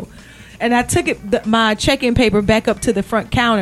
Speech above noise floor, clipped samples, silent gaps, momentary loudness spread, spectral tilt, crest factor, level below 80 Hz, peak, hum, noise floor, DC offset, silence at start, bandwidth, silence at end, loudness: 24 dB; under 0.1%; none; 5 LU; -4.5 dB/octave; 16 dB; -34 dBFS; 0 dBFS; none; -39 dBFS; under 0.1%; 0 s; 13.5 kHz; 0 s; -16 LUFS